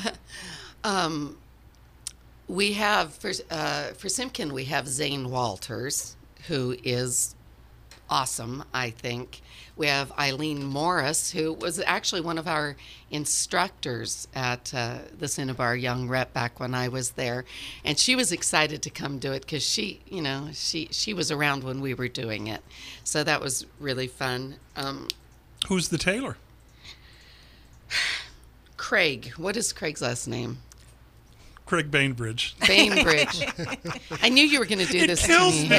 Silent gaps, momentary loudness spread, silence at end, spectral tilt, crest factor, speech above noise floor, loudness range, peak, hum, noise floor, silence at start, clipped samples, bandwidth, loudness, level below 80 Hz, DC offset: none; 14 LU; 0 s; -3 dB/octave; 28 dB; 26 dB; 7 LU; 0 dBFS; none; -53 dBFS; 0 s; under 0.1%; 15.5 kHz; -26 LUFS; -52 dBFS; under 0.1%